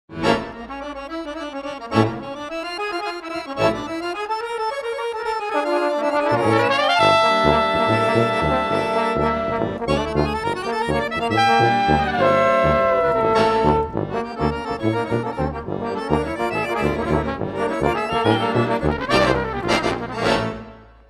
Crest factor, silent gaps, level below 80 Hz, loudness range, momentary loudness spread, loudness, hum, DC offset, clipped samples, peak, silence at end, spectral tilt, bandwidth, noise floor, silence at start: 18 dB; none; -38 dBFS; 7 LU; 11 LU; -20 LUFS; none; under 0.1%; under 0.1%; -2 dBFS; 0.25 s; -6 dB/octave; 14.5 kHz; -40 dBFS; 0.1 s